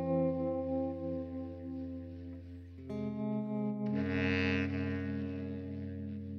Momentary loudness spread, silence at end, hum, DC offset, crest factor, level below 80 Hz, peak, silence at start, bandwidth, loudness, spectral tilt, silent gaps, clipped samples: 13 LU; 0 s; none; under 0.1%; 16 dB; -62 dBFS; -20 dBFS; 0 s; 6.6 kHz; -37 LUFS; -8.5 dB/octave; none; under 0.1%